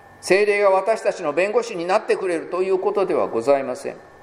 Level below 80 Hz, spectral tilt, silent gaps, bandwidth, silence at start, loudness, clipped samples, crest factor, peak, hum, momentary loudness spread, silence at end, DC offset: -64 dBFS; -4.5 dB/octave; none; 13 kHz; 0.25 s; -20 LUFS; under 0.1%; 18 dB; -2 dBFS; none; 6 LU; 0.2 s; under 0.1%